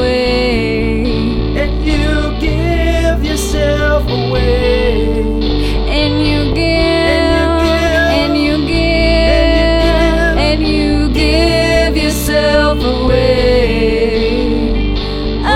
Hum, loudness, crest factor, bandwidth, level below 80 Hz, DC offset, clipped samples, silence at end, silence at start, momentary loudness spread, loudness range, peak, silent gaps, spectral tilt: none; -13 LUFS; 12 dB; 15.5 kHz; -18 dBFS; under 0.1%; under 0.1%; 0 s; 0 s; 5 LU; 3 LU; 0 dBFS; none; -5.5 dB/octave